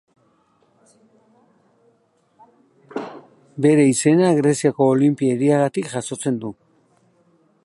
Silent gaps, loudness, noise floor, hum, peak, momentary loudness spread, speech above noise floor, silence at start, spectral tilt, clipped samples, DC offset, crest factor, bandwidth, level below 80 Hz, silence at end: none; -18 LUFS; -62 dBFS; none; -4 dBFS; 18 LU; 45 dB; 2.95 s; -6 dB/octave; under 0.1%; under 0.1%; 16 dB; 11.5 kHz; -68 dBFS; 1.15 s